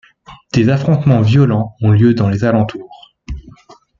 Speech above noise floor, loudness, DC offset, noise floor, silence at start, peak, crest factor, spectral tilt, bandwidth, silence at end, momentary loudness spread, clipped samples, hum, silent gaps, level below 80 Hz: 32 dB; -13 LUFS; under 0.1%; -43 dBFS; 0.3 s; -2 dBFS; 12 dB; -8.5 dB/octave; 7.2 kHz; 0.5 s; 20 LU; under 0.1%; none; none; -38 dBFS